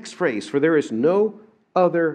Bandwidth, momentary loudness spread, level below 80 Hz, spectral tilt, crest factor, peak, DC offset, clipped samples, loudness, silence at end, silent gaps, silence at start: 10 kHz; 6 LU; -76 dBFS; -6.5 dB/octave; 16 dB; -4 dBFS; under 0.1%; under 0.1%; -21 LUFS; 0 s; none; 0.05 s